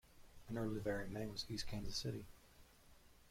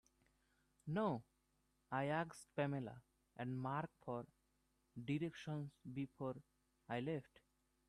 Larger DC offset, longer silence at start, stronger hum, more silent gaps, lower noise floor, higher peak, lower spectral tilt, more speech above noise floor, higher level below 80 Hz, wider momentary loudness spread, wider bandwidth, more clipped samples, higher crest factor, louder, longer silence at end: neither; second, 0.05 s vs 0.85 s; neither; neither; second, -66 dBFS vs -82 dBFS; about the same, -30 dBFS vs -28 dBFS; second, -5 dB/octave vs -7 dB/octave; second, 22 dB vs 37 dB; first, -58 dBFS vs -78 dBFS; first, 21 LU vs 13 LU; first, 16.5 kHz vs 13 kHz; neither; about the same, 16 dB vs 18 dB; about the same, -45 LUFS vs -46 LUFS; second, 0 s vs 0.65 s